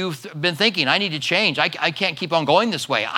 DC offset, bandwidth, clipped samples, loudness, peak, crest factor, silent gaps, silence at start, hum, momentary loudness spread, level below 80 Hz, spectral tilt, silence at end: under 0.1%; 18 kHz; under 0.1%; -19 LUFS; -2 dBFS; 20 dB; none; 0 s; none; 6 LU; -74 dBFS; -4 dB/octave; 0 s